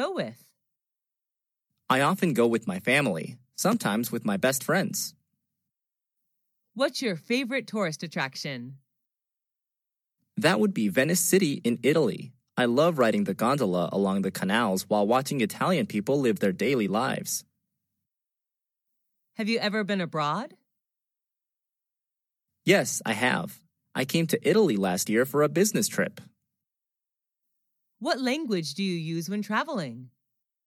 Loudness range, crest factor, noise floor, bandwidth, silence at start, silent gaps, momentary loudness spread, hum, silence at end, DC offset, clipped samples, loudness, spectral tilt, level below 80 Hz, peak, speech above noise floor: 7 LU; 22 dB; -89 dBFS; 17 kHz; 0 s; none; 11 LU; none; 0.6 s; under 0.1%; under 0.1%; -26 LUFS; -4.5 dB/octave; -76 dBFS; -6 dBFS; 63 dB